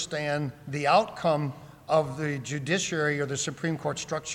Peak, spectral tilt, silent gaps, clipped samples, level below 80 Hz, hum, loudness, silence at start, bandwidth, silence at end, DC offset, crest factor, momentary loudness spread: -10 dBFS; -4.5 dB/octave; none; under 0.1%; -62 dBFS; none; -28 LUFS; 0 s; 16 kHz; 0 s; under 0.1%; 20 dB; 9 LU